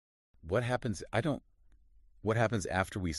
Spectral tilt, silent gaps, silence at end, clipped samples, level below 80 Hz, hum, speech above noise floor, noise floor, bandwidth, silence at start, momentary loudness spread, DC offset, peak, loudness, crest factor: -6 dB/octave; none; 0 s; under 0.1%; -54 dBFS; none; 30 dB; -62 dBFS; 11.5 kHz; 0.45 s; 6 LU; under 0.1%; -14 dBFS; -34 LUFS; 20 dB